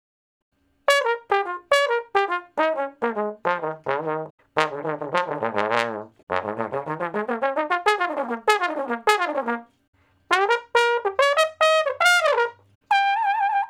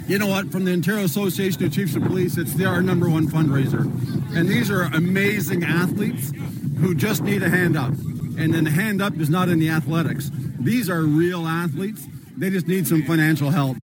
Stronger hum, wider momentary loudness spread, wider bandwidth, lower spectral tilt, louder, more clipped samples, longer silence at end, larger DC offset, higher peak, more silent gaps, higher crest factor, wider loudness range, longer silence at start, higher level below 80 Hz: neither; about the same, 9 LU vs 7 LU; about the same, 18 kHz vs 17 kHz; second, -3 dB/octave vs -6 dB/octave; about the same, -23 LUFS vs -21 LUFS; neither; second, 0 s vs 0.15 s; neither; first, 0 dBFS vs -6 dBFS; first, 4.30-4.38 s, 6.23-6.27 s, 9.88-9.93 s, 12.75-12.81 s vs none; first, 22 dB vs 16 dB; first, 6 LU vs 1 LU; first, 0.9 s vs 0 s; second, -72 dBFS vs -54 dBFS